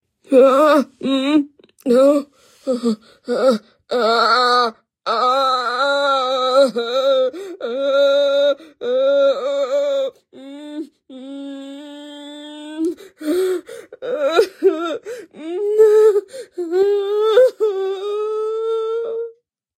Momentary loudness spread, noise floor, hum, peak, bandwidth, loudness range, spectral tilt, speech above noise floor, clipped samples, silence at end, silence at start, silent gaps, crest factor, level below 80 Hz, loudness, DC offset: 19 LU; -45 dBFS; none; -2 dBFS; 15 kHz; 9 LU; -4 dB/octave; 30 dB; under 0.1%; 0.45 s; 0.3 s; none; 16 dB; -72 dBFS; -17 LUFS; under 0.1%